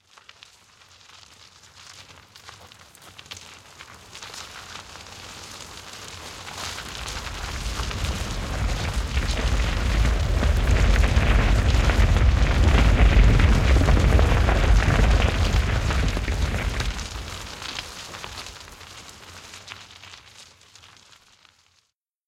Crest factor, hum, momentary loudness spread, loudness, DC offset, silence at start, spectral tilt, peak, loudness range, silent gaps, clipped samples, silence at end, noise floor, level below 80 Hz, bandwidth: 20 dB; none; 22 LU; -23 LUFS; under 0.1%; 1.9 s; -5 dB/octave; -4 dBFS; 22 LU; none; under 0.1%; 1.85 s; -70 dBFS; -24 dBFS; 13.5 kHz